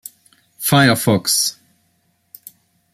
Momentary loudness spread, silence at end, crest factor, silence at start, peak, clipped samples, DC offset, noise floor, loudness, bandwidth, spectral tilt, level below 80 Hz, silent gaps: 10 LU; 1.4 s; 18 dB; 0.6 s; 0 dBFS; under 0.1%; under 0.1%; -63 dBFS; -15 LUFS; 16 kHz; -3.5 dB/octave; -56 dBFS; none